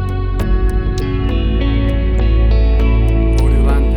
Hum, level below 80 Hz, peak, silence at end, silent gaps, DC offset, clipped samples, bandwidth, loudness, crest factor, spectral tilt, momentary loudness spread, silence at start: none; -14 dBFS; -2 dBFS; 0 s; none; under 0.1%; under 0.1%; 6.4 kHz; -15 LUFS; 10 dB; -8 dB/octave; 5 LU; 0 s